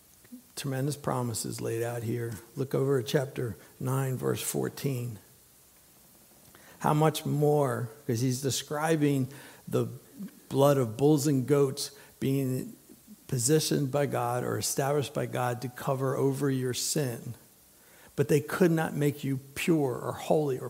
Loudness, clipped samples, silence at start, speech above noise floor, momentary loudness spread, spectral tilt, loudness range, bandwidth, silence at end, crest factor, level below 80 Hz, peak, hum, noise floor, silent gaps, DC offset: -29 LUFS; under 0.1%; 0.3 s; 30 dB; 11 LU; -5.5 dB/octave; 4 LU; 16 kHz; 0 s; 20 dB; -66 dBFS; -8 dBFS; none; -59 dBFS; none; under 0.1%